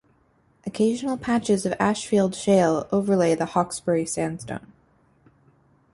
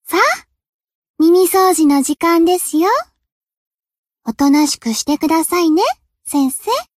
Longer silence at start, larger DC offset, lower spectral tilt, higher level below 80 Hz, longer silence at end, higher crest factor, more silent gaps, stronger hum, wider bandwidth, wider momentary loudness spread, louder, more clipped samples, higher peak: first, 0.65 s vs 0.1 s; neither; first, -5.5 dB/octave vs -2.5 dB/octave; about the same, -58 dBFS vs -54 dBFS; first, 1.35 s vs 0.15 s; about the same, 18 dB vs 14 dB; second, none vs 0.69-0.79 s, 0.95-1.02 s, 1.09-1.14 s, 3.32-3.41 s, 3.57-3.78 s, 3.98-4.04 s; neither; second, 11.5 kHz vs 15.5 kHz; first, 13 LU vs 8 LU; second, -23 LUFS vs -14 LUFS; neither; second, -6 dBFS vs 0 dBFS